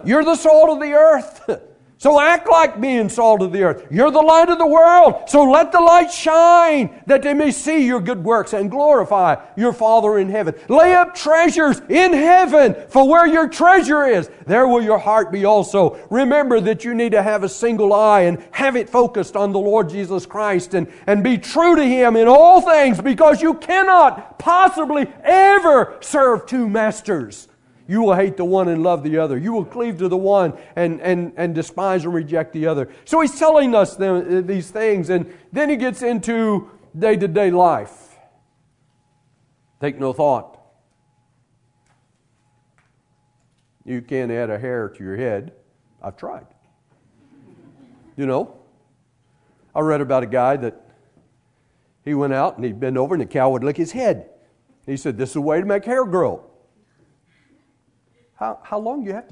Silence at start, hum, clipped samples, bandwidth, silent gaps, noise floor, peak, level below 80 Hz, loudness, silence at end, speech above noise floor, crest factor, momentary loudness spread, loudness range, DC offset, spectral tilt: 0.05 s; none; under 0.1%; 11 kHz; none; -63 dBFS; 0 dBFS; -54 dBFS; -15 LUFS; 0.1 s; 48 dB; 16 dB; 14 LU; 15 LU; under 0.1%; -5.5 dB/octave